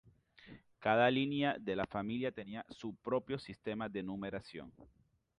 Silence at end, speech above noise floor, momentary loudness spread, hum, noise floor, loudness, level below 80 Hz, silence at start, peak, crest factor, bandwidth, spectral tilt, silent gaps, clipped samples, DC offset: 0.55 s; 23 dB; 19 LU; none; -60 dBFS; -37 LUFS; -68 dBFS; 0.4 s; -18 dBFS; 22 dB; 10.5 kHz; -7 dB/octave; none; under 0.1%; under 0.1%